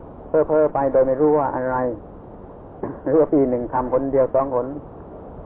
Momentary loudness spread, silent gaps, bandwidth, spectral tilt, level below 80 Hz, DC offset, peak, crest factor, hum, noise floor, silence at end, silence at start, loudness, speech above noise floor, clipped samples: 21 LU; none; 3 kHz; -13 dB/octave; -44 dBFS; under 0.1%; -8 dBFS; 14 dB; none; -39 dBFS; 0 s; 0 s; -20 LUFS; 20 dB; under 0.1%